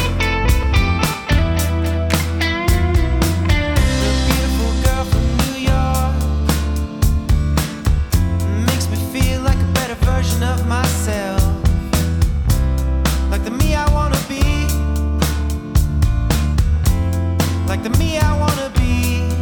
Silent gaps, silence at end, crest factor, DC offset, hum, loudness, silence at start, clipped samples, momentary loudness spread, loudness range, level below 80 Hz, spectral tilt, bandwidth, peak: none; 0 s; 12 dB; under 0.1%; none; -18 LUFS; 0 s; under 0.1%; 3 LU; 1 LU; -18 dBFS; -5.5 dB/octave; over 20 kHz; -4 dBFS